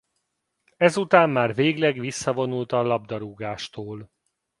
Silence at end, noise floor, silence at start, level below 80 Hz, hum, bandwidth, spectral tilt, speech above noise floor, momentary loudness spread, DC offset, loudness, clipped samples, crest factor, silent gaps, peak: 0.55 s; -77 dBFS; 0.8 s; -64 dBFS; none; 11.5 kHz; -5.5 dB/octave; 54 dB; 16 LU; under 0.1%; -23 LUFS; under 0.1%; 24 dB; none; 0 dBFS